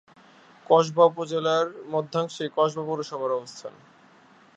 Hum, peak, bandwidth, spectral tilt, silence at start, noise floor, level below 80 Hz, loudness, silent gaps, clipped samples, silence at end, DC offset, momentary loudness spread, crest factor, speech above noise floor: none; -4 dBFS; 8 kHz; -5.5 dB/octave; 0.7 s; -55 dBFS; -78 dBFS; -25 LUFS; none; under 0.1%; 0.85 s; under 0.1%; 10 LU; 22 dB; 31 dB